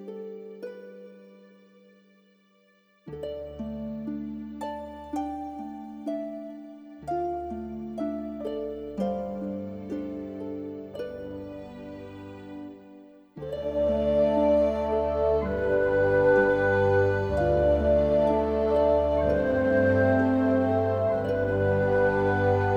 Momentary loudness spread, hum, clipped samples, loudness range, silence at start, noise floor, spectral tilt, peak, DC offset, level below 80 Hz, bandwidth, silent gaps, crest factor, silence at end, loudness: 19 LU; none; under 0.1%; 16 LU; 0 s; -63 dBFS; -8.5 dB/octave; -12 dBFS; under 0.1%; -44 dBFS; 9 kHz; none; 16 dB; 0 s; -26 LUFS